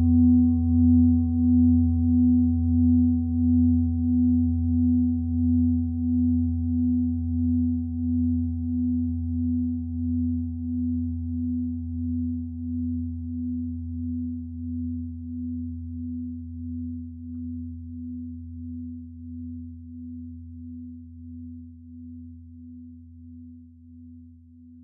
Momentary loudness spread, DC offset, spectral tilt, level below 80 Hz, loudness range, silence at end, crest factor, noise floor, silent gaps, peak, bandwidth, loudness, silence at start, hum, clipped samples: 21 LU; under 0.1%; -16.5 dB/octave; -42 dBFS; 20 LU; 0 s; 14 dB; -49 dBFS; none; -10 dBFS; 0.8 kHz; -25 LUFS; 0 s; none; under 0.1%